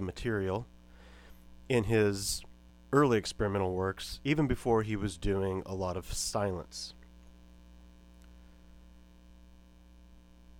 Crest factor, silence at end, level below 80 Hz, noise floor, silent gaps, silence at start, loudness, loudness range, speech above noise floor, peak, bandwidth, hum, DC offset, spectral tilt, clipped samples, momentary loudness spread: 22 dB; 0 s; -50 dBFS; -56 dBFS; none; 0 s; -32 LUFS; 10 LU; 25 dB; -12 dBFS; 17.5 kHz; 60 Hz at -55 dBFS; under 0.1%; -5 dB/octave; under 0.1%; 11 LU